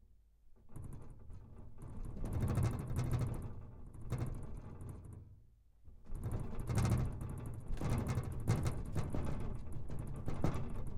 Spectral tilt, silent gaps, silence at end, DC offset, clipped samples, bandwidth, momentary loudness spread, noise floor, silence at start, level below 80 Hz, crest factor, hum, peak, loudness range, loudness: -7 dB/octave; none; 0 s; under 0.1%; under 0.1%; 16 kHz; 18 LU; -63 dBFS; 0.1 s; -46 dBFS; 18 dB; none; -22 dBFS; 6 LU; -41 LUFS